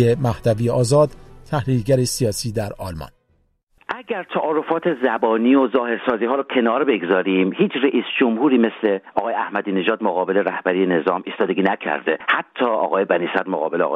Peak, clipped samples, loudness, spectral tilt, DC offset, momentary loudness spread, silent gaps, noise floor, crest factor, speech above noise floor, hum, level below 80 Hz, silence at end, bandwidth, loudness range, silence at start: -4 dBFS; under 0.1%; -19 LUFS; -6 dB/octave; under 0.1%; 8 LU; 3.63-3.67 s; -63 dBFS; 16 dB; 44 dB; none; -48 dBFS; 0 s; 15 kHz; 5 LU; 0 s